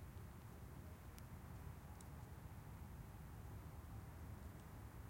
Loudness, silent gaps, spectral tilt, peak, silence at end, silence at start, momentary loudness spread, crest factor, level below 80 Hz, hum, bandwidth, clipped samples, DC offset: -57 LUFS; none; -6 dB/octave; -36 dBFS; 0 s; 0 s; 2 LU; 18 dB; -60 dBFS; none; 16.5 kHz; under 0.1%; under 0.1%